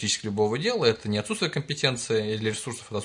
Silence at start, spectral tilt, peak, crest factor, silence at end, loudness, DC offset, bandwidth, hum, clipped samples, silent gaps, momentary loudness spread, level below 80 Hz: 0 s; -4 dB/octave; -6 dBFS; 20 dB; 0 s; -26 LUFS; under 0.1%; 11 kHz; none; under 0.1%; none; 5 LU; -64 dBFS